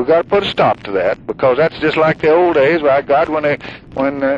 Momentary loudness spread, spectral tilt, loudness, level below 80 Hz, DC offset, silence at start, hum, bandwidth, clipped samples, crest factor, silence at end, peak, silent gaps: 7 LU; -7 dB/octave; -14 LUFS; -46 dBFS; under 0.1%; 0 s; none; 7.8 kHz; under 0.1%; 12 dB; 0 s; -2 dBFS; none